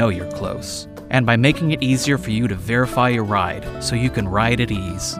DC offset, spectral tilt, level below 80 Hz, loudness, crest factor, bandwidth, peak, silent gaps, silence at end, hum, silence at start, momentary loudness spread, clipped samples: under 0.1%; -5.5 dB/octave; -38 dBFS; -19 LUFS; 18 dB; 15.5 kHz; -2 dBFS; none; 0 s; none; 0 s; 10 LU; under 0.1%